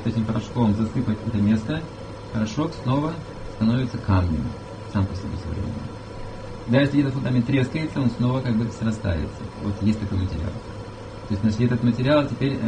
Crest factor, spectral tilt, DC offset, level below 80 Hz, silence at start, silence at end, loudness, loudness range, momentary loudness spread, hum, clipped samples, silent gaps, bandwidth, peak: 18 dB; -7.5 dB/octave; under 0.1%; -40 dBFS; 0 s; 0 s; -24 LUFS; 3 LU; 15 LU; none; under 0.1%; none; 9.6 kHz; -4 dBFS